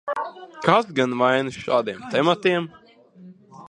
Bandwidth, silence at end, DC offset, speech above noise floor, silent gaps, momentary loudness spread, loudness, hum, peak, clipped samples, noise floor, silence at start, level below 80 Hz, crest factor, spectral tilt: 10.5 kHz; 0 s; under 0.1%; 26 dB; none; 10 LU; -22 LUFS; none; 0 dBFS; under 0.1%; -47 dBFS; 0.05 s; -64 dBFS; 22 dB; -5.5 dB/octave